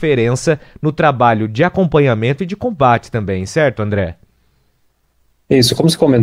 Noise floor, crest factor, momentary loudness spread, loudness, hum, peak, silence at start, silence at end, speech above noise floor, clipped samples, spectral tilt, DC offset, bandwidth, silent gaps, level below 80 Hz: -59 dBFS; 14 dB; 8 LU; -15 LUFS; none; 0 dBFS; 0 s; 0 s; 46 dB; under 0.1%; -6 dB/octave; under 0.1%; 16 kHz; none; -44 dBFS